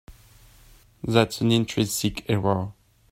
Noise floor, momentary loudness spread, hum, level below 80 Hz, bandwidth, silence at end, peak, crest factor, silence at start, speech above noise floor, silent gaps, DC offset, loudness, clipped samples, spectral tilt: -53 dBFS; 8 LU; none; -50 dBFS; 16 kHz; 0.4 s; -4 dBFS; 22 dB; 0.1 s; 30 dB; none; under 0.1%; -24 LUFS; under 0.1%; -5 dB/octave